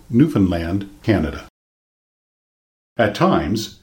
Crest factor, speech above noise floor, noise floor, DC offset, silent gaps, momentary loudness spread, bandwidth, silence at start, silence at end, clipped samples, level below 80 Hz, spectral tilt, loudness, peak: 18 dB; over 72 dB; under -90 dBFS; under 0.1%; 1.50-2.96 s; 10 LU; 17 kHz; 0.1 s; 0.1 s; under 0.1%; -40 dBFS; -7 dB/octave; -19 LUFS; -2 dBFS